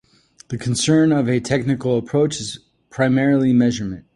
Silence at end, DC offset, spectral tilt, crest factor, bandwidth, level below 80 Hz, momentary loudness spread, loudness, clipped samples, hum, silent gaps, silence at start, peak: 0.15 s; under 0.1%; -5.5 dB/octave; 16 dB; 11.5 kHz; -50 dBFS; 13 LU; -18 LUFS; under 0.1%; none; none; 0.5 s; -2 dBFS